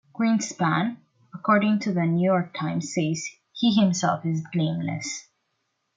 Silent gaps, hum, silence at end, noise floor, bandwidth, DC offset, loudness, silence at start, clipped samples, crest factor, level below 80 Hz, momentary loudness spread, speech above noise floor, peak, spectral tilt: none; none; 0.75 s; -76 dBFS; 9.2 kHz; under 0.1%; -24 LUFS; 0.15 s; under 0.1%; 18 dB; -68 dBFS; 10 LU; 52 dB; -6 dBFS; -5.5 dB/octave